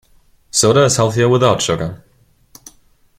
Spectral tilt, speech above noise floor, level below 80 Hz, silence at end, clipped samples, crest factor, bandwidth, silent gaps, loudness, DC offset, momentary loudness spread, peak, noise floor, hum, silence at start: -4 dB/octave; 40 dB; -46 dBFS; 1.25 s; under 0.1%; 16 dB; 16 kHz; none; -14 LUFS; under 0.1%; 9 LU; 0 dBFS; -54 dBFS; none; 0.55 s